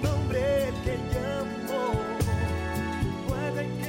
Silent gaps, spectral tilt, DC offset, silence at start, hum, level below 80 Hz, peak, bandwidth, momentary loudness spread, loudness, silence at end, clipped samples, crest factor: none; -6.5 dB/octave; under 0.1%; 0 s; none; -40 dBFS; -16 dBFS; 17 kHz; 5 LU; -29 LUFS; 0 s; under 0.1%; 12 dB